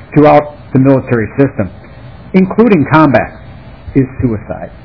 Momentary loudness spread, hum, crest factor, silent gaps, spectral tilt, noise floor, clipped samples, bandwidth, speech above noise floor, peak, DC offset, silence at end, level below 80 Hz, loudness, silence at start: 13 LU; none; 10 dB; none; -10.5 dB/octave; -32 dBFS; 2%; 5.4 kHz; 22 dB; 0 dBFS; 0.7%; 0.1 s; -36 dBFS; -10 LUFS; 0 s